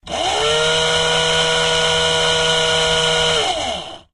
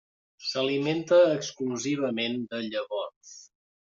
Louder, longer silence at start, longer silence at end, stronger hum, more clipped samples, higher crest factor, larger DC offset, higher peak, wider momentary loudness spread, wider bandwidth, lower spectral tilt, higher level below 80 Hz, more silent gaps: first, -15 LUFS vs -27 LUFS; second, 0.05 s vs 0.4 s; second, 0.15 s vs 0.5 s; neither; neither; about the same, 14 dB vs 18 dB; neither; first, -4 dBFS vs -10 dBFS; second, 5 LU vs 15 LU; first, 11.5 kHz vs 7.6 kHz; second, -1.5 dB/octave vs -3.5 dB/octave; first, -40 dBFS vs -76 dBFS; second, none vs 3.16-3.21 s